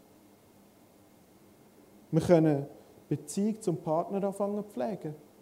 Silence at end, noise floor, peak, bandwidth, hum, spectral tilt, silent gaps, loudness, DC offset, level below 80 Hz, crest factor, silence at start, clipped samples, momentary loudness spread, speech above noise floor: 0.25 s; -59 dBFS; -8 dBFS; 16 kHz; none; -7.5 dB/octave; none; -30 LUFS; under 0.1%; -66 dBFS; 24 dB; 2.1 s; under 0.1%; 13 LU; 30 dB